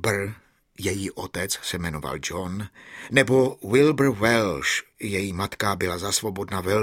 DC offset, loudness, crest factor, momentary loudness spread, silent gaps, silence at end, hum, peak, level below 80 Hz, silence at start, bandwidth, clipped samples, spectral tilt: under 0.1%; -24 LUFS; 24 dB; 11 LU; none; 0 s; none; -2 dBFS; -50 dBFS; 0 s; 17 kHz; under 0.1%; -4.5 dB/octave